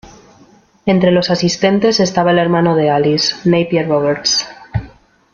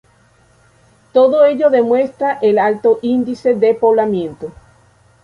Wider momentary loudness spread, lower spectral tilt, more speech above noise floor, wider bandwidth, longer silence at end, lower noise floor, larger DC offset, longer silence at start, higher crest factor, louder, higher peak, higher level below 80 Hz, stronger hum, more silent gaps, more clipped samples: about the same, 9 LU vs 9 LU; second, -5 dB/octave vs -7.5 dB/octave; second, 34 dB vs 38 dB; second, 7.4 kHz vs 10 kHz; second, 0.45 s vs 0.75 s; second, -47 dBFS vs -52 dBFS; neither; second, 0.05 s vs 1.15 s; about the same, 12 dB vs 14 dB; about the same, -13 LUFS vs -14 LUFS; about the same, -2 dBFS vs -2 dBFS; first, -44 dBFS vs -54 dBFS; neither; neither; neither